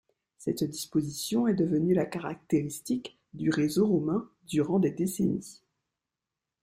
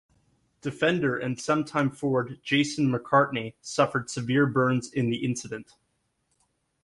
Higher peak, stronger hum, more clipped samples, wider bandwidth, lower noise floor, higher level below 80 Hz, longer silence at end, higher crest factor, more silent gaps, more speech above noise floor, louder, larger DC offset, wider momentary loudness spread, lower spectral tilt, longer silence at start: second, -12 dBFS vs -8 dBFS; neither; neither; first, 16 kHz vs 11.5 kHz; first, -89 dBFS vs -74 dBFS; about the same, -64 dBFS vs -64 dBFS; about the same, 1.1 s vs 1.2 s; about the same, 16 dB vs 20 dB; neither; first, 61 dB vs 49 dB; second, -29 LUFS vs -26 LUFS; neither; about the same, 8 LU vs 10 LU; about the same, -6 dB/octave vs -5.5 dB/octave; second, 0.4 s vs 0.65 s